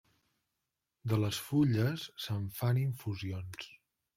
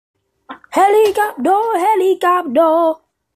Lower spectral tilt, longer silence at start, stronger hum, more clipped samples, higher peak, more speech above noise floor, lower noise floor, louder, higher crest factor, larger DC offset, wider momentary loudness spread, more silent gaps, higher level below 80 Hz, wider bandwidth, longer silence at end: first, -6.5 dB/octave vs -3.5 dB/octave; first, 1.05 s vs 0.5 s; neither; neither; second, -18 dBFS vs -2 dBFS; first, 54 dB vs 25 dB; first, -87 dBFS vs -38 dBFS; second, -34 LUFS vs -14 LUFS; first, 18 dB vs 12 dB; neither; first, 14 LU vs 6 LU; neither; second, -68 dBFS vs -62 dBFS; about the same, 16.5 kHz vs 15 kHz; about the same, 0.45 s vs 0.4 s